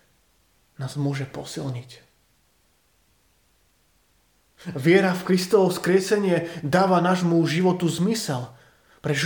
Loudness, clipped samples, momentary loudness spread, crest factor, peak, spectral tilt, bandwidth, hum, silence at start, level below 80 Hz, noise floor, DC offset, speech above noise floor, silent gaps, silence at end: -22 LUFS; under 0.1%; 14 LU; 20 dB; -4 dBFS; -6 dB/octave; 19 kHz; none; 0.8 s; -64 dBFS; -65 dBFS; under 0.1%; 43 dB; none; 0 s